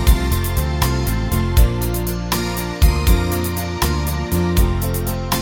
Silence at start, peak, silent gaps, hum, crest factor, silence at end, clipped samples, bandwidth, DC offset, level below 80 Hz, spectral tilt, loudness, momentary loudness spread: 0 s; 0 dBFS; none; none; 16 dB; 0 s; under 0.1%; 17.5 kHz; under 0.1%; -20 dBFS; -5 dB/octave; -19 LUFS; 4 LU